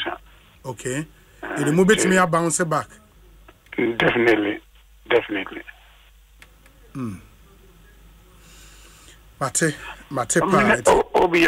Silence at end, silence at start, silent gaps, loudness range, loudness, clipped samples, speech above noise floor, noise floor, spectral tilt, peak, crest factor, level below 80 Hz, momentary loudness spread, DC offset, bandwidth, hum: 0 s; 0 s; none; 20 LU; -20 LUFS; under 0.1%; 31 dB; -51 dBFS; -4 dB/octave; -4 dBFS; 18 dB; -48 dBFS; 21 LU; under 0.1%; 16 kHz; none